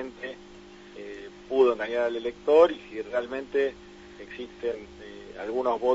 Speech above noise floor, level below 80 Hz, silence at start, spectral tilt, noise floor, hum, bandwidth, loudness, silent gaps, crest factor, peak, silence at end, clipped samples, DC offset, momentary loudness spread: 22 dB; -58 dBFS; 0 s; -5 dB/octave; -48 dBFS; 50 Hz at -55 dBFS; 7.8 kHz; -26 LUFS; none; 22 dB; -6 dBFS; 0 s; under 0.1%; under 0.1%; 23 LU